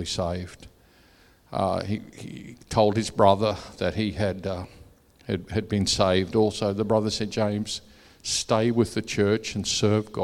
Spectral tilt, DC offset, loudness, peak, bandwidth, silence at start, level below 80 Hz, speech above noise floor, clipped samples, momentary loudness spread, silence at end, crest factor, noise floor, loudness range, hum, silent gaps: -5 dB/octave; under 0.1%; -25 LUFS; -4 dBFS; 14 kHz; 0 s; -50 dBFS; 32 dB; under 0.1%; 13 LU; 0 s; 22 dB; -57 dBFS; 2 LU; none; none